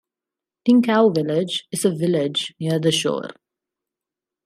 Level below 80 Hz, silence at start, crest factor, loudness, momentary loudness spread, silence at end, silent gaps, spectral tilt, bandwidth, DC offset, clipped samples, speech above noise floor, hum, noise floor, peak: -68 dBFS; 0.65 s; 18 dB; -20 LUFS; 9 LU; 1.15 s; none; -5 dB/octave; 15 kHz; under 0.1%; under 0.1%; 69 dB; none; -88 dBFS; -4 dBFS